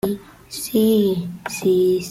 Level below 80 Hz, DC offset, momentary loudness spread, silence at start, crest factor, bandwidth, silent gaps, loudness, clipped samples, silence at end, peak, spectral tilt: -54 dBFS; under 0.1%; 14 LU; 0.05 s; 12 dB; 16 kHz; none; -20 LUFS; under 0.1%; 0 s; -6 dBFS; -5.5 dB/octave